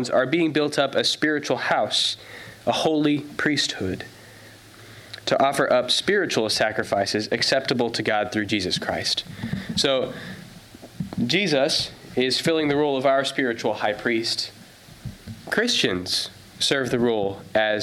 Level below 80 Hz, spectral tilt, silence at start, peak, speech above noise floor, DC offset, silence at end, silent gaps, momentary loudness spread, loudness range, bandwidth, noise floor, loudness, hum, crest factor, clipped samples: -56 dBFS; -3.5 dB/octave; 0 s; -6 dBFS; 23 dB; under 0.1%; 0 s; none; 12 LU; 3 LU; 16 kHz; -46 dBFS; -22 LUFS; none; 16 dB; under 0.1%